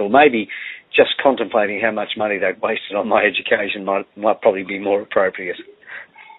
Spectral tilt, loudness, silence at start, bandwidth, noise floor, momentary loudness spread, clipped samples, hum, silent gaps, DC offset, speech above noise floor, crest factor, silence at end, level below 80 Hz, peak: -1.5 dB/octave; -18 LUFS; 0 s; 4.1 kHz; -38 dBFS; 13 LU; under 0.1%; none; none; under 0.1%; 20 dB; 18 dB; 0.05 s; -62 dBFS; 0 dBFS